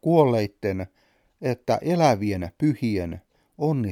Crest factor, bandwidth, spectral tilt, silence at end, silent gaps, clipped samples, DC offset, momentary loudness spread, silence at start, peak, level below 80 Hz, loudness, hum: 20 dB; 16 kHz; -7.5 dB/octave; 0 s; none; under 0.1%; under 0.1%; 13 LU; 0.05 s; -4 dBFS; -54 dBFS; -24 LUFS; none